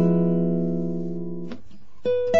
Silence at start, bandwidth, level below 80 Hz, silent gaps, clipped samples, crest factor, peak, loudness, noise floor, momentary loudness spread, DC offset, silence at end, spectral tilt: 0 s; 6.4 kHz; -60 dBFS; none; under 0.1%; 14 dB; -8 dBFS; -25 LUFS; -49 dBFS; 15 LU; 3%; 0 s; -9 dB/octave